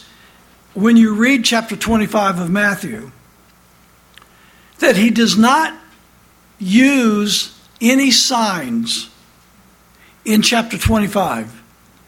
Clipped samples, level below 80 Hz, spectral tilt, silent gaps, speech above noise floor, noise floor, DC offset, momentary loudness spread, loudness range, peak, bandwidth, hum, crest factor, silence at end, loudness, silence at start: under 0.1%; -38 dBFS; -3.5 dB/octave; none; 35 dB; -49 dBFS; under 0.1%; 14 LU; 4 LU; 0 dBFS; 16.5 kHz; none; 16 dB; 0.55 s; -14 LUFS; 0.75 s